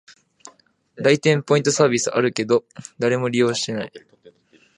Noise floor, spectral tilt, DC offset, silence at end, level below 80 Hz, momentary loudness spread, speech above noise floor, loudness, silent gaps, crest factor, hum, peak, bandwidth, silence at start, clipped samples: -53 dBFS; -4.5 dB/octave; under 0.1%; 0.8 s; -66 dBFS; 9 LU; 34 dB; -20 LUFS; none; 20 dB; none; -2 dBFS; 11 kHz; 0.95 s; under 0.1%